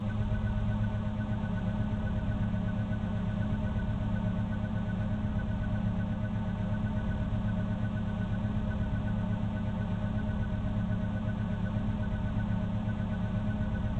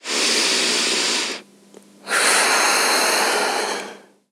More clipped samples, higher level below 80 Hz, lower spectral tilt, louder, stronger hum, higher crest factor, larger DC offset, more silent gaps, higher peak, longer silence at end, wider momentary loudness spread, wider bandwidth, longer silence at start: neither; first, -38 dBFS vs -86 dBFS; first, -9 dB/octave vs 0.5 dB/octave; second, -33 LUFS vs -17 LUFS; neither; about the same, 12 dB vs 16 dB; neither; neither; second, -18 dBFS vs -4 dBFS; second, 0 s vs 0.35 s; second, 1 LU vs 11 LU; second, 4.4 kHz vs 17 kHz; about the same, 0 s vs 0.05 s